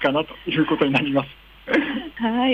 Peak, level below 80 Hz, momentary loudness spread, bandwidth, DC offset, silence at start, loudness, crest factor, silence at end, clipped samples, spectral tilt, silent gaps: -6 dBFS; -52 dBFS; 8 LU; 15.5 kHz; under 0.1%; 0 s; -22 LUFS; 14 dB; 0 s; under 0.1%; -7 dB/octave; none